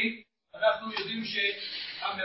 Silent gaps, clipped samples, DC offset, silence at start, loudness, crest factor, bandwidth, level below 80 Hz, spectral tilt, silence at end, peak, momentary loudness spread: none; under 0.1%; under 0.1%; 0 s; -30 LUFS; 20 dB; 5.8 kHz; -72 dBFS; -6.5 dB/octave; 0 s; -12 dBFS; 7 LU